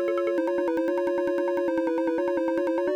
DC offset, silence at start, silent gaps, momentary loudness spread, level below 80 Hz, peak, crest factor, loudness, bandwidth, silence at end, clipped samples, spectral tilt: under 0.1%; 0 s; none; 0 LU; -66 dBFS; -16 dBFS; 10 dB; -26 LUFS; 8.8 kHz; 0 s; under 0.1%; -6 dB/octave